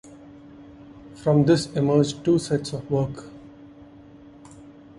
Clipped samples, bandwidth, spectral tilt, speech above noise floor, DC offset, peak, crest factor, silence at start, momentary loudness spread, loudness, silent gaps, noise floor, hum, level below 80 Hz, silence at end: under 0.1%; 11.5 kHz; -7 dB/octave; 25 dB; under 0.1%; -6 dBFS; 20 dB; 0.05 s; 23 LU; -22 LUFS; none; -47 dBFS; none; -54 dBFS; 0.3 s